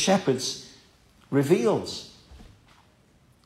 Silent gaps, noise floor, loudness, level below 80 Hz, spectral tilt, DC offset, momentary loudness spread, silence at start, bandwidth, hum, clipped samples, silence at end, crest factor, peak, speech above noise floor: none; -60 dBFS; -26 LUFS; -60 dBFS; -4.5 dB/octave; under 0.1%; 18 LU; 0 s; 15.5 kHz; none; under 0.1%; 1 s; 20 dB; -8 dBFS; 36 dB